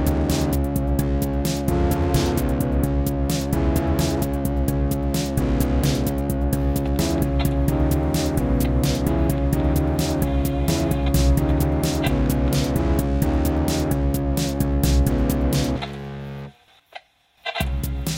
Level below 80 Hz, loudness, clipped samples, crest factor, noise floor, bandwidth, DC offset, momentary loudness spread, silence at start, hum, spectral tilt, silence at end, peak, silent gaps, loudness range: -26 dBFS; -22 LUFS; under 0.1%; 14 dB; -46 dBFS; 17 kHz; under 0.1%; 3 LU; 0 s; none; -6 dB/octave; 0 s; -6 dBFS; none; 2 LU